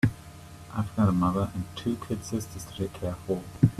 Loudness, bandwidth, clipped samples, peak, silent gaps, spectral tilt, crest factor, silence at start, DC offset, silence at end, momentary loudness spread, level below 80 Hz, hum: -30 LUFS; 14.5 kHz; under 0.1%; -6 dBFS; none; -7 dB/octave; 22 dB; 0.05 s; under 0.1%; 0 s; 14 LU; -50 dBFS; none